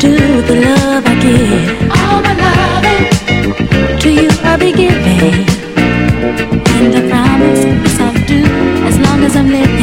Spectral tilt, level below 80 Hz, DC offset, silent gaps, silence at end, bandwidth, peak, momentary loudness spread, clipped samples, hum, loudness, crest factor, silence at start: -5.5 dB/octave; -24 dBFS; under 0.1%; none; 0 s; 16.5 kHz; 0 dBFS; 3 LU; 0.3%; none; -9 LUFS; 8 dB; 0 s